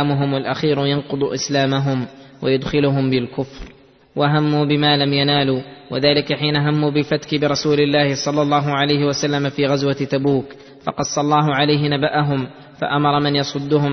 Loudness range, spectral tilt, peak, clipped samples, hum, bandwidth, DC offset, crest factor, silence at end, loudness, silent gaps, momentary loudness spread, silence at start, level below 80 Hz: 3 LU; -5.5 dB/octave; -2 dBFS; under 0.1%; none; 6.4 kHz; under 0.1%; 16 dB; 0 s; -18 LUFS; none; 9 LU; 0 s; -50 dBFS